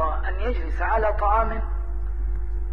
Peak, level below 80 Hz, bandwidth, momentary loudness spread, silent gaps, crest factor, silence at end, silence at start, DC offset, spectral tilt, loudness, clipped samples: -8 dBFS; -26 dBFS; 4.2 kHz; 9 LU; none; 16 dB; 0 s; 0 s; 3%; -8.5 dB/octave; -26 LUFS; under 0.1%